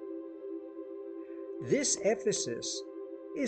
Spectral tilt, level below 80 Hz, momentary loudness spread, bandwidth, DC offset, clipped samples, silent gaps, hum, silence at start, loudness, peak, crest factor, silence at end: -3 dB/octave; -74 dBFS; 15 LU; 9 kHz; under 0.1%; under 0.1%; none; none; 0 s; -34 LUFS; -16 dBFS; 18 dB; 0 s